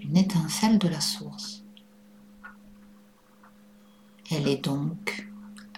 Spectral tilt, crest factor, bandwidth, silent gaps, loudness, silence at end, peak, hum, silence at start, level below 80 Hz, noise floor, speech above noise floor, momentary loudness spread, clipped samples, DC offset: -5 dB/octave; 20 dB; 16.5 kHz; none; -27 LUFS; 0 s; -10 dBFS; none; 0 s; -62 dBFS; -56 dBFS; 31 dB; 25 LU; under 0.1%; under 0.1%